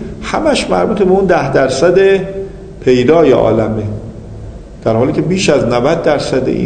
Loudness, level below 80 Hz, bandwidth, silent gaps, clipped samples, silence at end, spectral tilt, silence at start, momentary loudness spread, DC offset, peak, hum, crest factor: -12 LUFS; -34 dBFS; 9.4 kHz; none; 0.2%; 0 s; -6 dB/octave; 0 s; 17 LU; under 0.1%; 0 dBFS; none; 12 dB